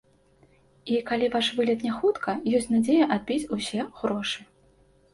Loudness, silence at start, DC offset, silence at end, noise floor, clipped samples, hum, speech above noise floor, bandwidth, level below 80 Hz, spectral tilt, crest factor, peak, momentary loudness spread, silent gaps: -26 LUFS; 0.85 s; under 0.1%; 0.7 s; -60 dBFS; under 0.1%; none; 35 dB; 11.5 kHz; -60 dBFS; -4.5 dB/octave; 18 dB; -10 dBFS; 8 LU; none